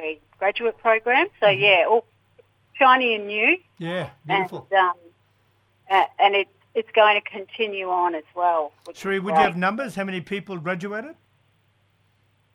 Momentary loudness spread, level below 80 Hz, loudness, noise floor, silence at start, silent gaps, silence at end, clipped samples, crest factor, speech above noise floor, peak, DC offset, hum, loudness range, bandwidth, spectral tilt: 14 LU; -68 dBFS; -21 LUFS; -64 dBFS; 0 s; none; 1.45 s; under 0.1%; 20 dB; 43 dB; -2 dBFS; under 0.1%; none; 6 LU; 13 kHz; -5 dB/octave